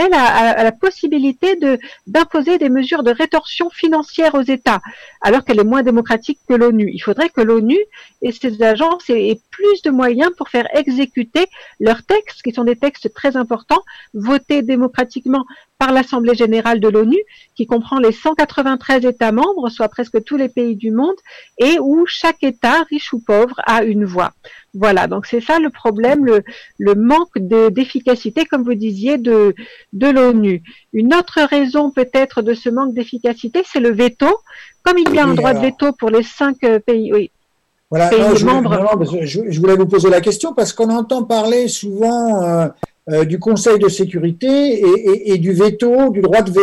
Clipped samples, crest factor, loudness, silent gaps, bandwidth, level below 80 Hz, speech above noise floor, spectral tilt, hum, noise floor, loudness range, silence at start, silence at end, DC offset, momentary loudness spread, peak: under 0.1%; 12 dB; -14 LUFS; none; 13 kHz; -48 dBFS; 50 dB; -5.5 dB/octave; none; -64 dBFS; 2 LU; 0 s; 0 s; 0.2%; 7 LU; -2 dBFS